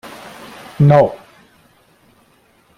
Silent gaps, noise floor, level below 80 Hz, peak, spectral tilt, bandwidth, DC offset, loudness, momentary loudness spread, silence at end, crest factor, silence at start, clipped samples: none; -54 dBFS; -50 dBFS; 0 dBFS; -8.5 dB/octave; 11.5 kHz; under 0.1%; -13 LUFS; 24 LU; 1.6 s; 18 dB; 0.05 s; under 0.1%